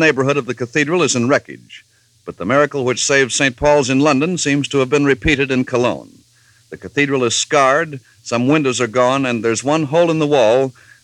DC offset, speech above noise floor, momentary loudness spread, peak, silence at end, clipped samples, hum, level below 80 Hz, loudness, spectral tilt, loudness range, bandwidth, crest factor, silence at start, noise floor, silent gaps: under 0.1%; 37 dB; 10 LU; 0 dBFS; 0.3 s; under 0.1%; none; -44 dBFS; -15 LUFS; -4 dB/octave; 3 LU; 11.5 kHz; 16 dB; 0 s; -52 dBFS; none